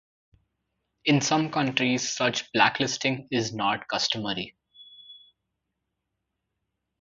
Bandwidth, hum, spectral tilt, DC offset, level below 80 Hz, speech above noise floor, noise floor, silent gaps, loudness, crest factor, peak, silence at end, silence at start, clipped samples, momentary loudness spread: 7.6 kHz; none; -3.5 dB/octave; under 0.1%; -66 dBFS; 56 dB; -82 dBFS; none; -25 LUFS; 24 dB; -4 dBFS; 1.85 s; 1.05 s; under 0.1%; 8 LU